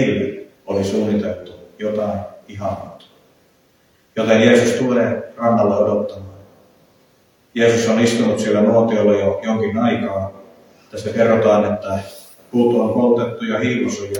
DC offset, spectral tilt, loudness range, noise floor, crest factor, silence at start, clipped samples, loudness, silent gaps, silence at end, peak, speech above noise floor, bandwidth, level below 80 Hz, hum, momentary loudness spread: under 0.1%; -6 dB/octave; 7 LU; -57 dBFS; 18 dB; 0 s; under 0.1%; -17 LUFS; none; 0 s; 0 dBFS; 40 dB; 18.5 kHz; -58 dBFS; none; 15 LU